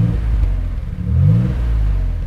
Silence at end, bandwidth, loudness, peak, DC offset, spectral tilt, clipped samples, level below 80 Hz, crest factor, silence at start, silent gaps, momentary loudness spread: 0 s; 4.6 kHz; -18 LUFS; -4 dBFS; under 0.1%; -9.5 dB/octave; under 0.1%; -18 dBFS; 12 dB; 0 s; none; 9 LU